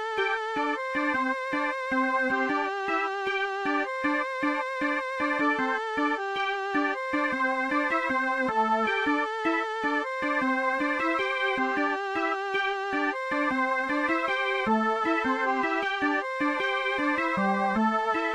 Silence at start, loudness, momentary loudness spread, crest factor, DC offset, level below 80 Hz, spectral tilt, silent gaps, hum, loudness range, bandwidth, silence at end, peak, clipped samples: 0 s; -27 LUFS; 3 LU; 14 dB; under 0.1%; -64 dBFS; -4.5 dB/octave; none; none; 1 LU; 10.5 kHz; 0 s; -14 dBFS; under 0.1%